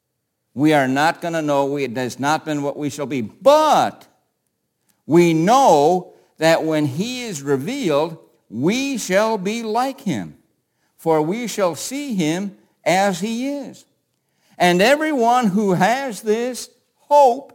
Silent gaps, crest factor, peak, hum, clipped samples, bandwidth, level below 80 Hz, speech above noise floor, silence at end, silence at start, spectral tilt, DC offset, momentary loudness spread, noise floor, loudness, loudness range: none; 18 dB; -2 dBFS; none; under 0.1%; 17 kHz; -66 dBFS; 56 dB; 0.1 s; 0.55 s; -5 dB/octave; under 0.1%; 12 LU; -74 dBFS; -18 LUFS; 5 LU